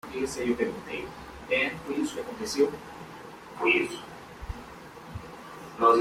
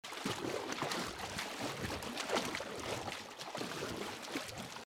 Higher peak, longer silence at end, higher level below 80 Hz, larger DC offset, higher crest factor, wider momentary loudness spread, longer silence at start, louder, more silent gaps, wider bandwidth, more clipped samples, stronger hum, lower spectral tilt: first, -8 dBFS vs -24 dBFS; about the same, 0 s vs 0 s; first, -52 dBFS vs -64 dBFS; neither; first, 22 dB vs 16 dB; first, 19 LU vs 6 LU; about the same, 0.05 s vs 0.05 s; first, -28 LUFS vs -40 LUFS; neither; about the same, 16 kHz vs 17.5 kHz; neither; neither; about the same, -4 dB/octave vs -3 dB/octave